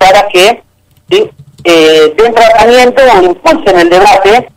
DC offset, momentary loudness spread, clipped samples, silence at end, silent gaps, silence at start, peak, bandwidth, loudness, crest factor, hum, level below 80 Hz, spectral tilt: under 0.1%; 7 LU; 3%; 0.1 s; none; 0 s; 0 dBFS; 16.5 kHz; -5 LUFS; 4 dB; none; -34 dBFS; -3.5 dB/octave